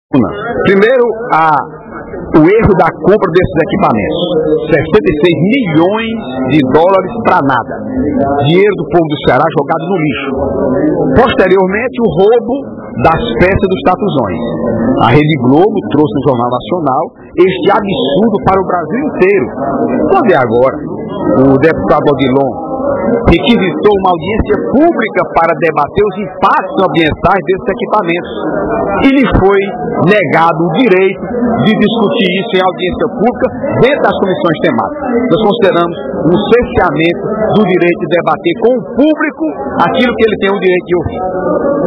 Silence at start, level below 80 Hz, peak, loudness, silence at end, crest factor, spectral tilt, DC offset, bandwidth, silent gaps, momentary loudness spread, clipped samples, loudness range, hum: 0.1 s; -32 dBFS; 0 dBFS; -10 LUFS; 0 s; 10 dB; -9 dB/octave; under 0.1%; 5.4 kHz; none; 6 LU; 1%; 2 LU; none